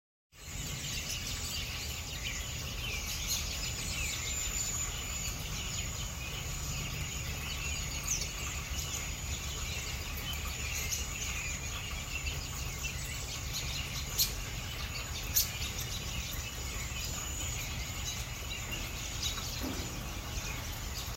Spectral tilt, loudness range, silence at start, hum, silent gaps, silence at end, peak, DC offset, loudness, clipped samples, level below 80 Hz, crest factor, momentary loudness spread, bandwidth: -2 dB/octave; 3 LU; 0.35 s; none; none; 0 s; -12 dBFS; under 0.1%; -36 LUFS; under 0.1%; -44 dBFS; 24 dB; 5 LU; 16 kHz